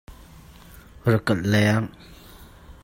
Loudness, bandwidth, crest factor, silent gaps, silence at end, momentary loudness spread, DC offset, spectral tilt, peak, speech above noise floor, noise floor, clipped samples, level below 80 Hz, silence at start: -22 LUFS; 16.5 kHz; 18 dB; none; 0.1 s; 8 LU; under 0.1%; -6.5 dB/octave; -6 dBFS; 25 dB; -46 dBFS; under 0.1%; -48 dBFS; 0.1 s